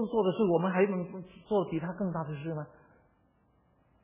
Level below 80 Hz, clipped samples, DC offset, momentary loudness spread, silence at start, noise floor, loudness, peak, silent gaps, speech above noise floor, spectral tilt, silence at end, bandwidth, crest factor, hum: -66 dBFS; under 0.1%; under 0.1%; 14 LU; 0 s; -69 dBFS; -31 LUFS; -14 dBFS; none; 38 dB; -7 dB/octave; 1.35 s; 3.8 kHz; 18 dB; none